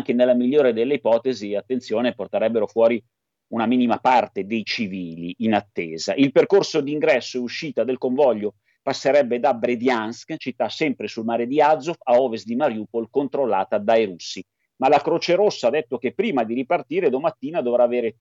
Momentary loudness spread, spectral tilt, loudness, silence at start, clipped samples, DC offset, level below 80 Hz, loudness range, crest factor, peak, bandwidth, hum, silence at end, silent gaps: 9 LU; -5.5 dB/octave; -21 LUFS; 0 s; under 0.1%; under 0.1%; -74 dBFS; 1 LU; 16 dB; -4 dBFS; 7.8 kHz; none; 0.1 s; none